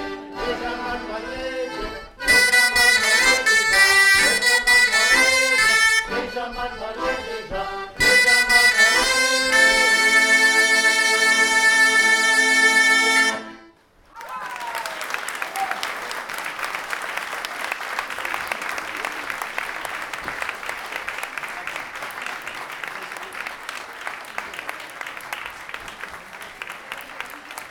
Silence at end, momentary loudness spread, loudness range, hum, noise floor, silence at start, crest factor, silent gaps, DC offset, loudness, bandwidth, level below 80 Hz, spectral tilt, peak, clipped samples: 0 s; 19 LU; 17 LU; none; -52 dBFS; 0 s; 18 dB; none; under 0.1%; -17 LUFS; 19.5 kHz; -48 dBFS; 0 dB/octave; -2 dBFS; under 0.1%